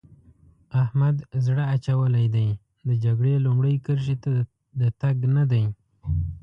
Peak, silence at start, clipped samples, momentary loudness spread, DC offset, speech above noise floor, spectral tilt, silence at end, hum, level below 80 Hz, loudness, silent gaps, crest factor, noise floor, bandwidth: -12 dBFS; 0.7 s; under 0.1%; 7 LU; under 0.1%; 33 dB; -9.5 dB/octave; 0.05 s; none; -42 dBFS; -24 LUFS; none; 12 dB; -55 dBFS; 5.8 kHz